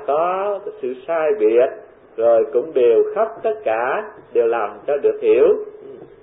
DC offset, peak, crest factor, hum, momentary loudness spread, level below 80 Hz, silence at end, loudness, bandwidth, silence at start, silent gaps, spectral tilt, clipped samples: under 0.1%; -4 dBFS; 14 dB; none; 12 LU; -62 dBFS; 0.2 s; -18 LUFS; 3.8 kHz; 0 s; none; -10 dB/octave; under 0.1%